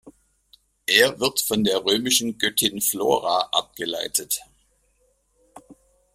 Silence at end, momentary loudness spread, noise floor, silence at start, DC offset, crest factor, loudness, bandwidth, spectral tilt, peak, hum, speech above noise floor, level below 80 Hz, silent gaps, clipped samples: 0.4 s; 10 LU; -66 dBFS; 0.05 s; under 0.1%; 22 dB; -21 LUFS; 16 kHz; -1.5 dB/octave; -2 dBFS; none; 43 dB; -60 dBFS; none; under 0.1%